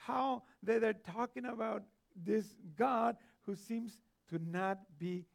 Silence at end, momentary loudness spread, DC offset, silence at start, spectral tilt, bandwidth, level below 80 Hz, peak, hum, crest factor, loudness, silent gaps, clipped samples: 0.1 s; 12 LU; under 0.1%; 0 s; -7 dB/octave; 15.5 kHz; -82 dBFS; -20 dBFS; none; 18 dB; -39 LUFS; none; under 0.1%